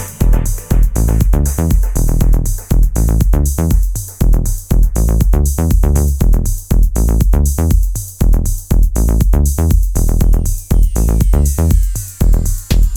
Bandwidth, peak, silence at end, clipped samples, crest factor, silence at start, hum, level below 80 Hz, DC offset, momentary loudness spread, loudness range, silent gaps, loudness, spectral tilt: 18 kHz; 0 dBFS; 0 s; under 0.1%; 10 dB; 0 s; none; -12 dBFS; 0.8%; 4 LU; 1 LU; none; -15 LUFS; -6.5 dB/octave